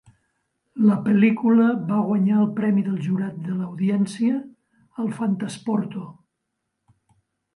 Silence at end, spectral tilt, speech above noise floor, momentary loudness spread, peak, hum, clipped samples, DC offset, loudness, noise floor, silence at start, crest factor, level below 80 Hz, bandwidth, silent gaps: 1.45 s; -8 dB/octave; 58 dB; 12 LU; -6 dBFS; none; under 0.1%; under 0.1%; -22 LUFS; -78 dBFS; 0.75 s; 16 dB; -70 dBFS; 11 kHz; none